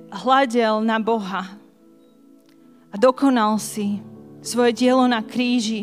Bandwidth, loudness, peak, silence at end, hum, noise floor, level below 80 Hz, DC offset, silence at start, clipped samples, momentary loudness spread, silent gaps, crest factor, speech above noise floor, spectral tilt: 15.5 kHz; -20 LUFS; -4 dBFS; 0 s; none; -52 dBFS; -72 dBFS; under 0.1%; 0 s; under 0.1%; 12 LU; none; 18 dB; 33 dB; -4.5 dB/octave